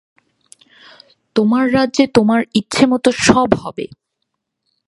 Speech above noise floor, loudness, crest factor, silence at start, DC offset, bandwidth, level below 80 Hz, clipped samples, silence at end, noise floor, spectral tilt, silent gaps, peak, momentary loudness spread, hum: 60 dB; -14 LUFS; 16 dB; 1.35 s; under 0.1%; 11.5 kHz; -46 dBFS; under 0.1%; 1 s; -74 dBFS; -4.5 dB/octave; none; 0 dBFS; 10 LU; none